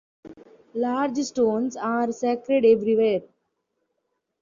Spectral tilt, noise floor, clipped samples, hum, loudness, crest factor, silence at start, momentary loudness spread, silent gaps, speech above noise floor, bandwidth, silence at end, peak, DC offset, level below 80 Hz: -5.5 dB/octave; -77 dBFS; under 0.1%; none; -23 LUFS; 16 dB; 0.25 s; 8 LU; none; 55 dB; 7.4 kHz; 1.15 s; -8 dBFS; under 0.1%; -68 dBFS